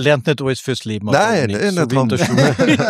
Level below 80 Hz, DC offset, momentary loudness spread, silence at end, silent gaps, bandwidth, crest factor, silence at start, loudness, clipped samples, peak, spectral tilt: -52 dBFS; under 0.1%; 7 LU; 0 s; none; 15 kHz; 14 dB; 0 s; -16 LUFS; under 0.1%; -2 dBFS; -5.5 dB/octave